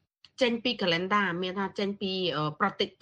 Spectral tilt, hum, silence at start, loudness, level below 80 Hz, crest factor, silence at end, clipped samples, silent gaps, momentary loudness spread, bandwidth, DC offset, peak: -5.5 dB/octave; none; 0.4 s; -29 LUFS; -68 dBFS; 20 dB; 0.15 s; under 0.1%; none; 6 LU; 9.6 kHz; under 0.1%; -10 dBFS